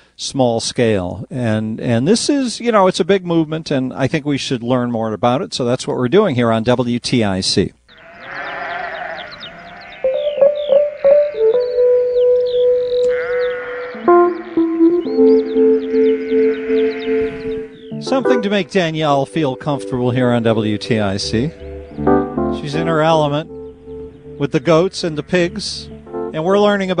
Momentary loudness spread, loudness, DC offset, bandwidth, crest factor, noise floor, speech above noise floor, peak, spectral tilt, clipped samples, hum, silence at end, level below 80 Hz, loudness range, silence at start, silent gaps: 12 LU; -16 LUFS; under 0.1%; 10.5 kHz; 16 dB; -39 dBFS; 23 dB; 0 dBFS; -5.5 dB/octave; under 0.1%; none; 0 s; -44 dBFS; 4 LU; 0.2 s; none